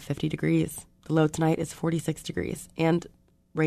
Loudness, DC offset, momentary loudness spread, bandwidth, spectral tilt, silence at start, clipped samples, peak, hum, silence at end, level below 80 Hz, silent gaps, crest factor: -28 LUFS; under 0.1%; 8 LU; 13.5 kHz; -6.5 dB/octave; 0 s; under 0.1%; -10 dBFS; none; 0 s; -54 dBFS; none; 18 dB